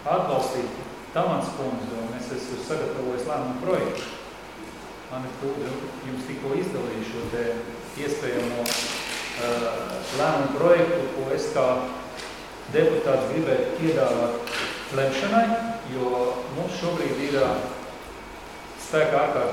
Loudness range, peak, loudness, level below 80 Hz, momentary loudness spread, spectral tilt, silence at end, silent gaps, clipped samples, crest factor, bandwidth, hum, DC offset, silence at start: 7 LU; -4 dBFS; -26 LUFS; -54 dBFS; 14 LU; -5 dB/octave; 0 s; none; under 0.1%; 22 dB; 16 kHz; none; under 0.1%; 0 s